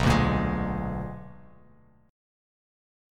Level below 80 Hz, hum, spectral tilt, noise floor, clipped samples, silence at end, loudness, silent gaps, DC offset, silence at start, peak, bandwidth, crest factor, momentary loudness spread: -38 dBFS; none; -6.5 dB/octave; -58 dBFS; under 0.1%; 1.75 s; -28 LUFS; none; under 0.1%; 0 s; -10 dBFS; 14.5 kHz; 20 dB; 20 LU